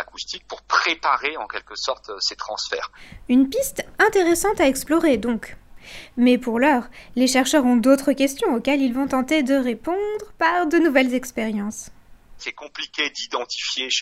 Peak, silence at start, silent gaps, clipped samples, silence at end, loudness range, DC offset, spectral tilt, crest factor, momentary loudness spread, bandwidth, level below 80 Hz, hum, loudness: -4 dBFS; 0 s; none; under 0.1%; 0 s; 4 LU; under 0.1%; -3 dB/octave; 18 dB; 14 LU; 16 kHz; -50 dBFS; none; -21 LUFS